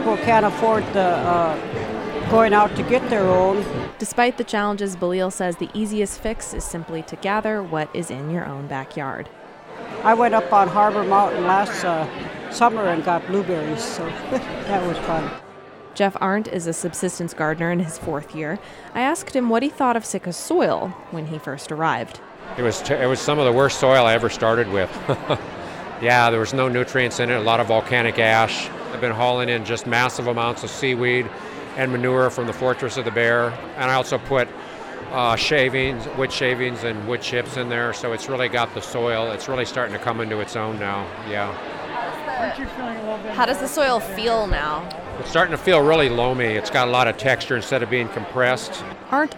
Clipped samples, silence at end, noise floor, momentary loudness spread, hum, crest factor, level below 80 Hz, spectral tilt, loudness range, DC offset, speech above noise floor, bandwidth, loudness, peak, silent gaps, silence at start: under 0.1%; 0 s; -41 dBFS; 12 LU; none; 18 dB; -44 dBFS; -4.5 dB/octave; 6 LU; under 0.1%; 20 dB; 17 kHz; -21 LUFS; -4 dBFS; none; 0 s